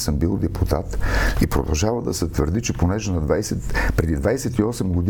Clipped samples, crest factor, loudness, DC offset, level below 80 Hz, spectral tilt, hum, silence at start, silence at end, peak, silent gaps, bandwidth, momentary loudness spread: under 0.1%; 16 dB; -22 LUFS; under 0.1%; -26 dBFS; -5.5 dB/octave; none; 0 s; 0 s; -4 dBFS; none; 18 kHz; 2 LU